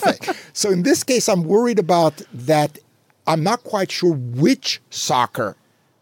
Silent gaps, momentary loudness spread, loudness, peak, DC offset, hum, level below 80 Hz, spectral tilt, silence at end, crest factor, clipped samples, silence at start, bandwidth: none; 9 LU; -19 LUFS; -4 dBFS; under 0.1%; none; -72 dBFS; -4.5 dB/octave; 0.5 s; 14 dB; under 0.1%; 0 s; 17 kHz